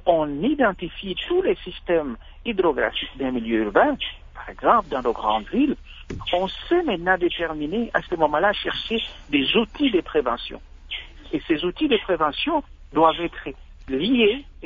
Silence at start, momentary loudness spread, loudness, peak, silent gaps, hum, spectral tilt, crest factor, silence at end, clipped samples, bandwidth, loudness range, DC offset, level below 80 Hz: 0 s; 13 LU; -23 LUFS; -2 dBFS; none; none; -6.5 dB/octave; 20 dB; 0 s; under 0.1%; 7.4 kHz; 2 LU; under 0.1%; -44 dBFS